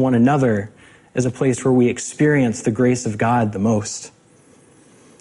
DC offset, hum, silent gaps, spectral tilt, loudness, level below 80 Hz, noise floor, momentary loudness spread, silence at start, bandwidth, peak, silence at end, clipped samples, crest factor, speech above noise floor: under 0.1%; none; none; -6.5 dB/octave; -18 LUFS; -54 dBFS; -51 dBFS; 12 LU; 0 s; 11.5 kHz; -4 dBFS; 1.15 s; under 0.1%; 14 dB; 34 dB